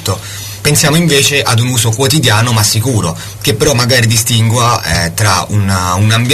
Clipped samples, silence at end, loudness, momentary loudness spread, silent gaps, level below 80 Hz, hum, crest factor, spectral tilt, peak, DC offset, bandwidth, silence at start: under 0.1%; 0 s; -10 LUFS; 7 LU; none; -34 dBFS; none; 10 dB; -3.5 dB/octave; 0 dBFS; under 0.1%; 14 kHz; 0 s